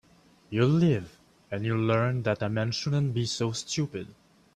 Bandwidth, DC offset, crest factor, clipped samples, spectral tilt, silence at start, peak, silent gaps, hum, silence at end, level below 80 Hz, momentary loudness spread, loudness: 10.5 kHz; under 0.1%; 18 dB; under 0.1%; -6 dB/octave; 0.5 s; -10 dBFS; none; none; 0.45 s; -62 dBFS; 11 LU; -28 LUFS